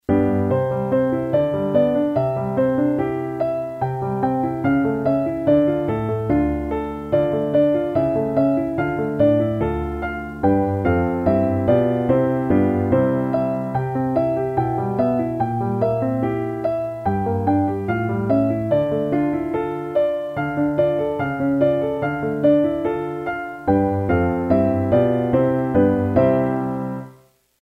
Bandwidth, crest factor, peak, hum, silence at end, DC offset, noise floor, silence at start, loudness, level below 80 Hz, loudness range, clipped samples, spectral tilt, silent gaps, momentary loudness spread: 5 kHz; 16 dB; -4 dBFS; none; 0.5 s; under 0.1%; -52 dBFS; 0.1 s; -20 LUFS; -42 dBFS; 2 LU; under 0.1%; -10 dB/octave; none; 6 LU